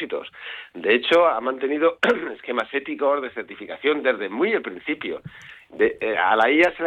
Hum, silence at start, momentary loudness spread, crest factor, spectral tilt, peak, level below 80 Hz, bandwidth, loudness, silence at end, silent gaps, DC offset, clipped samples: none; 0 s; 17 LU; 16 dB; -5 dB/octave; -6 dBFS; -62 dBFS; 9.4 kHz; -22 LUFS; 0 s; none; under 0.1%; under 0.1%